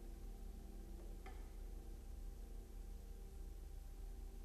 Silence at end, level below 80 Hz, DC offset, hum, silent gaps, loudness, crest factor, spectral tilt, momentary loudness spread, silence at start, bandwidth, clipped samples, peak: 0 s; -52 dBFS; under 0.1%; none; none; -57 LUFS; 10 dB; -6 dB/octave; 1 LU; 0 s; 14 kHz; under 0.1%; -42 dBFS